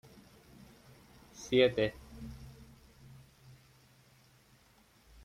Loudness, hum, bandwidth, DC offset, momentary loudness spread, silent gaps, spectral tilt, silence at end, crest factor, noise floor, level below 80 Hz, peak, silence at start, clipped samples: -30 LUFS; none; 15.5 kHz; under 0.1%; 30 LU; none; -5 dB/octave; 2.75 s; 26 dB; -65 dBFS; -60 dBFS; -12 dBFS; 1.4 s; under 0.1%